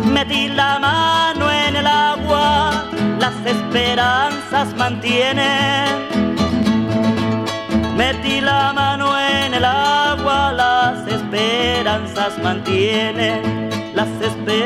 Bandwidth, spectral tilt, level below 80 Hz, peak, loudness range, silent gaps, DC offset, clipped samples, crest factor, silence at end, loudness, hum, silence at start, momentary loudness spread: 15.5 kHz; -4.5 dB/octave; -40 dBFS; -2 dBFS; 2 LU; none; under 0.1%; under 0.1%; 14 dB; 0 s; -16 LUFS; none; 0 s; 5 LU